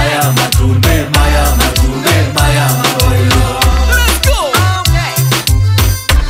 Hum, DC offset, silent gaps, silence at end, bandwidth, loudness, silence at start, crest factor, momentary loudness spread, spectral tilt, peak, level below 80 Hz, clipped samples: none; under 0.1%; none; 0 s; 16.5 kHz; -10 LUFS; 0 s; 10 dB; 2 LU; -4 dB/octave; 0 dBFS; -14 dBFS; under 0.1%